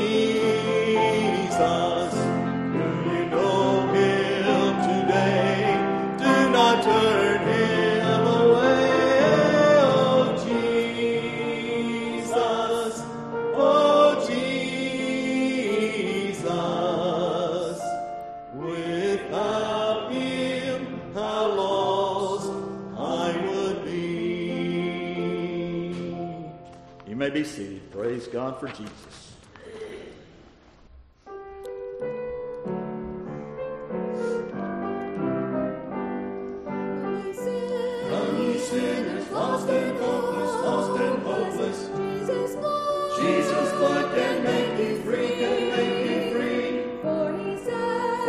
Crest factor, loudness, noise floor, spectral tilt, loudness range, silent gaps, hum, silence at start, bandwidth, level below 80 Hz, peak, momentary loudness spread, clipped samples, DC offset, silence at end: 20 dB; -24 LUFS; -52 dBFS; -5.5 dB/octave; 13 LU; none; none; 0 s; 13 kHz; -58 dBFS; -4 dBFS; 14 LU; under 0.1%; under 0.1%; 0 s